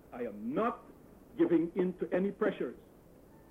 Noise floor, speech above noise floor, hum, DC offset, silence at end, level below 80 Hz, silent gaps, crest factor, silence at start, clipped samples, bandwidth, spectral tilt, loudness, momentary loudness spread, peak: -58 dBFS; 25 dB; none; under 0.1%; 0.7 s; -66 dBFS; none; 16 dB; 0.1 s; under 0.1%; 3.9 kHz; -9 dB/octave; -33 LUFS; 15 LU; -18 dBFS